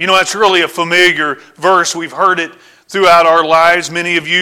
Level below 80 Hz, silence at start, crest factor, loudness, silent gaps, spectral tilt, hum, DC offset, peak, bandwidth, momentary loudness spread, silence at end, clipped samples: -52 dBFS; 0 s; 12 dB; -10 LUFS; none; -2.5 dB/octave; none; under 0.1%; 0 dBFS; 16.5 kHz; 9 LU; 0 s; under 0.1%